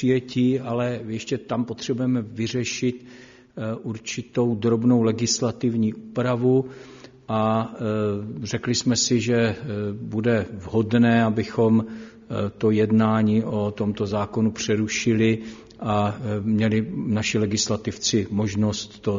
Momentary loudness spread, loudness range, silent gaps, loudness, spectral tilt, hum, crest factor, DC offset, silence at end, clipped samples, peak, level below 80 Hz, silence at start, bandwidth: 10 LU; 4 LU; none; -23 LUFS; -5.5 dB/octave; none; 16 dB; under 0.1%; 0 s; under 0.1%; -8 dBFS; -56 dBFS; 0 s; 7.4 kHz